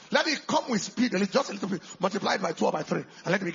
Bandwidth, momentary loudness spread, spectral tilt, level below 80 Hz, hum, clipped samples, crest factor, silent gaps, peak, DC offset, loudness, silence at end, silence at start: 7.6 kHz; 7 LU; -4 dB/octave; -72 dBFS; none; under 0.1%; 20 dB; none; -8 dBFS; under 0.1%; -28 LUFS; 0 s; 0 s